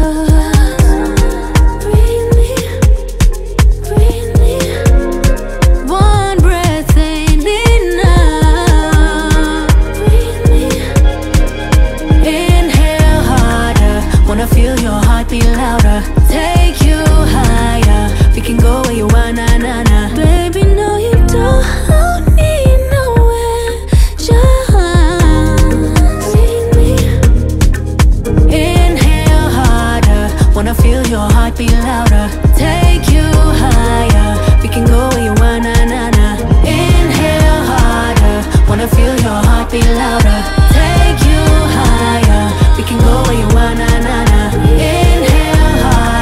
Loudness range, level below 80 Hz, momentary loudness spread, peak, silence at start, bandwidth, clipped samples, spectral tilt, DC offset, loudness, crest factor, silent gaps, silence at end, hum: 1 LU; -10 dBFS; 3 LU; 0 dBFS; 0 s; 15.5 kHz; under 0.1%; -6 dB/octave; under 0.1%; -11 LUFS; 8 dB; none; 0 s; none